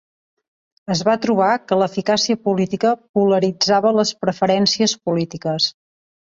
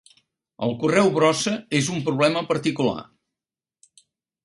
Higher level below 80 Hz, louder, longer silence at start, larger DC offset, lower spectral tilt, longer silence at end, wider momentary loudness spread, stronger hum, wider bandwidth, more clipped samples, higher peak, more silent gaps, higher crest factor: about the same, -60 dBFS vs -62 dBFS; first, -18 LUFS vs -22 LUFS; first, 0.9 s vs 0.6 s; neither; about the same, -4.5 dB/octave vs -4.5 dB/octave; second, 0.6 s vs 1.4 s; about the same, 6 LU vs 8 LU; neither; second, 7.8 kHz vs 11.5 kHz; neither; about the same, -4 dBFS vs -4 dBFS; first, 3.09-3.14 s vs none; about the same, 16 dB vs 20 dB